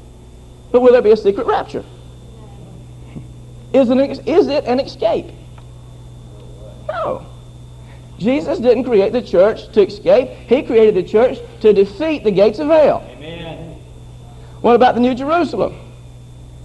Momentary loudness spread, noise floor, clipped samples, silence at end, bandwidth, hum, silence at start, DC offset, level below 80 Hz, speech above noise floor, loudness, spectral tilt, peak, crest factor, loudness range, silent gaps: 19 LU; -38 dBFS; under 0.1%; 0 s; 9.8 kHz; none; 0.7 s; under 0.1%; -42 dBFS; 25 dB; -15 LUFS; -7 dB/octave; 0 dBFS; 16 dB; 8 LU; none